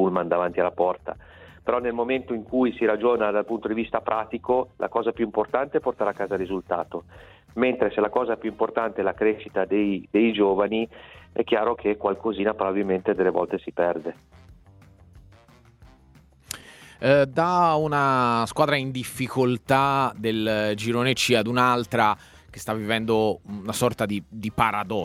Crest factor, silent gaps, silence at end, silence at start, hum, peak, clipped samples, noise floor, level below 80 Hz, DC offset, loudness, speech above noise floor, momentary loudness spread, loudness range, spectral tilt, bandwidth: 20 dB; none; 0 s; 0 s; none; -4 dBFS; under 0.1%; -54 dBFS; -56 dBFS; under 0.1%; -24 LUFS; 31 dB; 10 LU; 5 LU; -5.5 dB/octave; 16 kHz